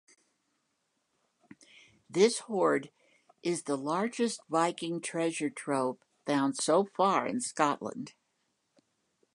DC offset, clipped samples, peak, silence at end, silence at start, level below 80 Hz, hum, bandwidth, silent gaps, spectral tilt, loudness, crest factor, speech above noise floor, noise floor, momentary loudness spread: under 0.1%; under 0.1%; -10 dBFS; 1.25 s; 2.1 s; -84 dBFS; none; 11.5 kHz; none; -4 dB/octave; -31 LUFS; 22 dB; 49 dB; -79 dBFS; 10 LU